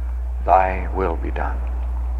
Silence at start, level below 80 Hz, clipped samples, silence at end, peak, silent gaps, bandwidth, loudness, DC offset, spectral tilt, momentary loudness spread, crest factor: 0 s; -24 dBFS; under 0.1%; 0 s; -2 dBFS; none; 4.1 kHz; -22 LUFS; under 0.1%; -9 dB/octave; 10 LU; 20 dB